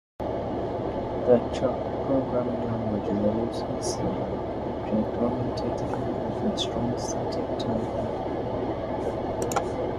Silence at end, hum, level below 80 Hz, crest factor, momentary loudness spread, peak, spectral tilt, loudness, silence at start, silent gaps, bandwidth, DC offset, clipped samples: 0 s; none; -44 dBFS; 20 dB; 5 LU; -8 dBFS; -6 dB/octave; -28 LUFS; 0.2 s; none; 14 kHz; under 0.1%; under 0.1%